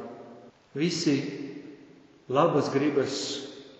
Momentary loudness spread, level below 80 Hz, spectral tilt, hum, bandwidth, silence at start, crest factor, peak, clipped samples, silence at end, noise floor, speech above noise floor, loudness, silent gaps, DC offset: 21 LU; -74 dBFS; -5 dB/octave; none; 8.2 kHz; 0 s; 22 dB; -8 dBFS; under 0.1%; 0.05 s; -54 dBFS; 27 dB; -27 LUFS; none; under 0.1%